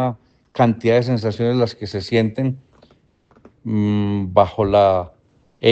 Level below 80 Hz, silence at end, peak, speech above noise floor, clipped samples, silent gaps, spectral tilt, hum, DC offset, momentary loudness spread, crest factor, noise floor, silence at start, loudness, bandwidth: -50 dBFS; 0 s; 0 dBFS; 39 dB; under 0.1%; none; -8 dB/octave; none; under 0.1%; 15 LU; 18 dB; -57 dBFS; 0 s; -19 LUFS; 8.2 kHz